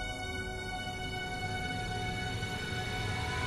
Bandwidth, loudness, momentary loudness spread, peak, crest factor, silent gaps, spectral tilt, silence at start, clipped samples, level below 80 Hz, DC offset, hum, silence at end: 12.5 kHz; -36 LUFS; 3 LU; -22 dBFS; 14 dB; none; -4 dB/octave; 0 s; under 0.1%; -46 dBFS; under 0.1%; none; 0 s